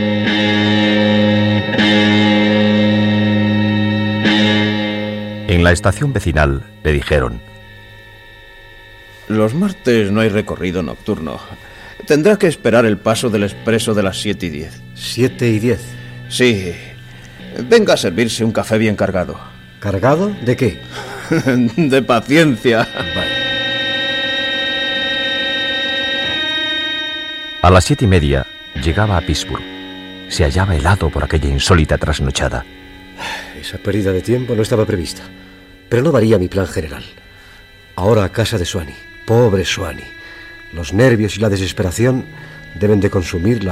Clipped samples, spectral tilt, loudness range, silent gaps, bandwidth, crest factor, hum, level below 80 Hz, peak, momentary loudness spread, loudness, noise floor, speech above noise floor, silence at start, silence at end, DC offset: under 0.1%; -5.5 dB/octave; 5 LU; none; 15.5 kHz; 16 dB; none; -30 dBFS; 0 dBFS; 16 LU; -15 LUFS; -41 dBFS; 26 dB; 0 s; 0 s; under 0.1%